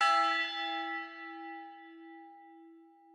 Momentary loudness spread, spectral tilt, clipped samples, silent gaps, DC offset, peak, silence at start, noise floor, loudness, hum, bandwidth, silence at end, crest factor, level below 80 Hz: 25 LU; 0.5 dB/octave; under 0.1%; none; under 0.1%; -16 dBFS; 0 s; -58 dBFS; -33 LUFS; none; 12 kHz; 0.3 s; 20 dB; under -90 dBFS